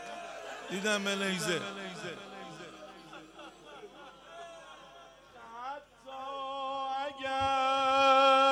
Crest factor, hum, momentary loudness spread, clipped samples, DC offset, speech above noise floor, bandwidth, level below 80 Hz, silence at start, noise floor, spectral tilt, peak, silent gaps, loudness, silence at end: 20 dB; none; 25 LU; under 0.1%; under 0.1%; 21 dB; 14.5 kHz; -68 dBFS; 0 s; -55 dBFS; -3 dB/octave; -12 dBFS; none; -31 LUFS; 0 s